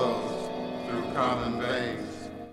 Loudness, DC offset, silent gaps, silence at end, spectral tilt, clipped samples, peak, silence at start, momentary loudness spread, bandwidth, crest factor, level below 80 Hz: -31 LUFS; under 0.1%; none; 0 s; -5.5 dB/octave; under 0.1%; -14 dBFS; 0 s; 9 LU; 14 kHz; 18 dB; -56 dBFS